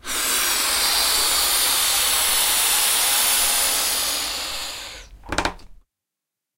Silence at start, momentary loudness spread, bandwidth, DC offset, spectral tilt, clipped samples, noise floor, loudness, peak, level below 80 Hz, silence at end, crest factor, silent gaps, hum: 0.05 s; 11 LU; 16 kHz; under 0.1%; 1 dB/octave; under 0.1%; -85 dBFS; -18 LUFS; -6 dBFS; -44 dBFS; 0.85 s; 16 dB; none; none